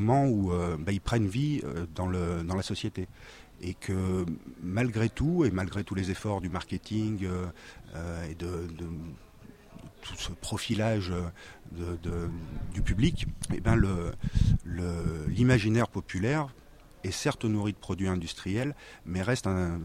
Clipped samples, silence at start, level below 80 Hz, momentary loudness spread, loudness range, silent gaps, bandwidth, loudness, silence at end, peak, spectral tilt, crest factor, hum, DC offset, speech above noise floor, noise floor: under 0.1%; 0 s; -42 dBFS; 13 LU; 7 LU; none; 15 kHz; -31 LUFS; 0 s; -10 dBFS; -6.5 dB/octave; 20 dB; none; under 0.1%; 22 dB; -52 dBFS